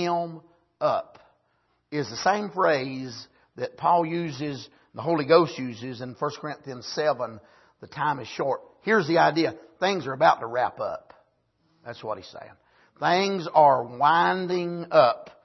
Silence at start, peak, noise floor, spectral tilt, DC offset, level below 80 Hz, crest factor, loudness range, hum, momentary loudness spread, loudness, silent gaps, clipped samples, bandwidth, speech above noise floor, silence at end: 0 s; -4 dBFS; -70 dBFS; -5.5 dB/octave; under 0.1%; -70 dBFS; 22 dB; 5 LU; none; 16 LU; -25 LUFS; none; under 0.1%; 6.2 kHz; 46 dB; 0.2 s